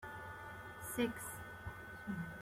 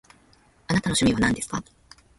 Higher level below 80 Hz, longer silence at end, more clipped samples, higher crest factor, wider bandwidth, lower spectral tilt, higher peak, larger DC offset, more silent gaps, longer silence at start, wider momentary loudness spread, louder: second, -64 dBFS vs -46 dBFS; second, 0 s vs 0.55 s; neither; about the same, 20 dB vs 20 dB; first, 16.5 kHz vs 12 kHz; about the same, -4.5 dB/octave vs -4 dB/octave; second, -26 dBFS vs -8 dBFS; neither; neither; second, 0 s vs 0.7 s; about the same, 10 LU vs 11 LU; second, -45 LUFS vs -24 LUFS